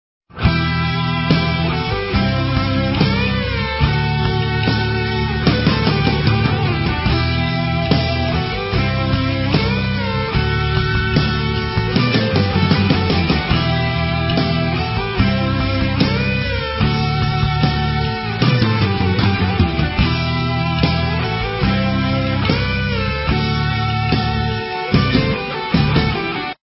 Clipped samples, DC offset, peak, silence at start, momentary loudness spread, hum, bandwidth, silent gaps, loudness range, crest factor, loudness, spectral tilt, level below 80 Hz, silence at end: under 0.1%; under 0.1%; 0 dBFS; 0.35 s; 4 LU; none; 5.8 kHz; none; 1 LU; 16 dB; -17 LUFS; -10 dB/octave; -26 dBFS; 0.1 s